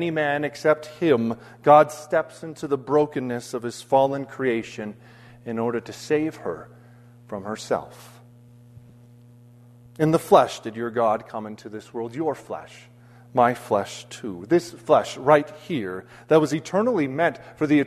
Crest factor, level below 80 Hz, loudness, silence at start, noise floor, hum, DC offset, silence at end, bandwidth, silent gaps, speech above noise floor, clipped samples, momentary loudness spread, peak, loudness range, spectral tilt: 22 dB; -64 dBFS; -23 LUFS; 0 s; -49 dBFS; none; under 0.1%; 0 s; 13.5 kHz; none; 27 dB; under 0.1%; 16 LU; -2 dBFS; 9 LU; -6 dB/octave